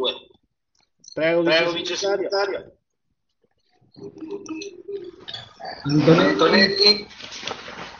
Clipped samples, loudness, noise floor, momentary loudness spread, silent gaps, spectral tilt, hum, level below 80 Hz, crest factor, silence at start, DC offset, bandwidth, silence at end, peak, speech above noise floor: under 0.1%; -19 LUFS; -77 dBFS; 20 LU; none; -3 dB/octave; none; -60 dBFS; 20 dB; 0 s; under 0.1%; 7.4 kHz; 0 s; -2 dBFS; 56 dB